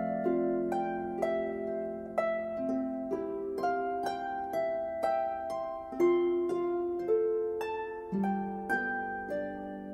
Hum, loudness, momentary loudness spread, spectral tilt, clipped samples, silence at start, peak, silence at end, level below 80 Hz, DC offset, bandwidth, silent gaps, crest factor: none; -33 LUFS; 7 LU; -7.5 dB/octave; under 0.1%; 0 s; -16 dBFS; 0 s; -64 dBFS; under 0.1%; 12.5 kHz; none; 16 dB